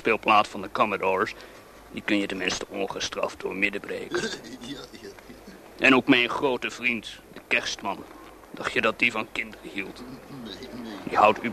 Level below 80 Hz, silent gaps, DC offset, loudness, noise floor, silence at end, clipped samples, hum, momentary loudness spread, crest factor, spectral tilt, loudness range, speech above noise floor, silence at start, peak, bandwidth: -58 dBFS; none; under 0.1%; -25 LUFS; -46 dBFS; 0 s; under 0.1%; none; 22 LU; 24 dB; -3.5 dB/octave; 5 LU; 19 dB; 0 s; -4 dBFS; 13.5 kHz